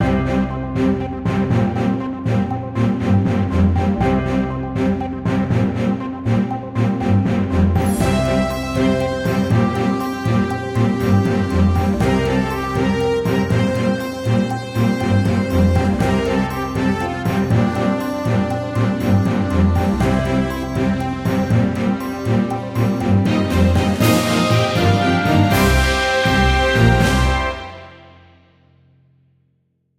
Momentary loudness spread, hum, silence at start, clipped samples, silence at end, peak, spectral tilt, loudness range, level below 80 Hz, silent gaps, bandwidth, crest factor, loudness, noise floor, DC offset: 6 LU; none; 0 s; under 0.1%; 2 s; -2 dBFS; -6.5 dB/octave; 4 LU; -30 dBFS; none; 16.5 kHz; 16 dB; -18 LUFS; -65 dBFS; under 0.1%